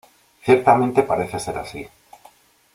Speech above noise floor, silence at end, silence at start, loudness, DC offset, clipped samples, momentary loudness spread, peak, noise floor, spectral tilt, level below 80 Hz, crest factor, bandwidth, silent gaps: 34 dB; 0.85 s; 0.45 s; -19 LUFS; under 0.1%; under 0.1%; 20 LU; -2 dBFS; -52 dBFS; -6 dB/octave; -54 dBFS; 20 dB; 15 kHz; none